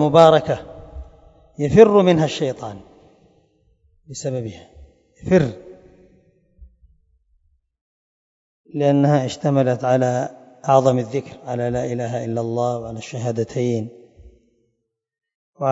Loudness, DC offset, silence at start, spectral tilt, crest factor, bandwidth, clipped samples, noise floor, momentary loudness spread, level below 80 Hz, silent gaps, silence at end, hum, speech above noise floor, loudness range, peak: -19 LUFS; under 0.1%; 0 s; -7 dB/octave; 20 dB; 8 kHz; under 0.1%; -75 dBFS; 22 LU; -50 dBFS; 7.81-8.64 s, 15.35-15.53 s; 0 s; none; 57 dB; 8 LU; 0 dBFS